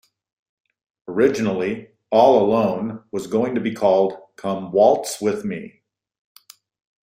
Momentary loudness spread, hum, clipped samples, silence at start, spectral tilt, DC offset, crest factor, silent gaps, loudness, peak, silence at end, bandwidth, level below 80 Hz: 14 LU; none; under 0.1%; 1.1 s; -5.5 dB/octave; under 0.1%; 20 dB; none; -20 LUFS; -2 dBFS; 1.35 s; 16 kHz; -62 dBFS